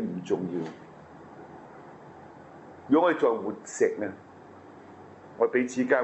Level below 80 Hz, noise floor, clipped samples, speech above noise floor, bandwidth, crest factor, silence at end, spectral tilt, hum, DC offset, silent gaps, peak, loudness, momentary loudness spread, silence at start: -74 dBFS; -49 dBFS; under 0.1%; 23 dB; 8.2 kHz; 22 dB; 0 s; -5.5 dB/octave; none; under 0.1%; none; -8 dBFS; -27 LUFS; 25 LU; 0 s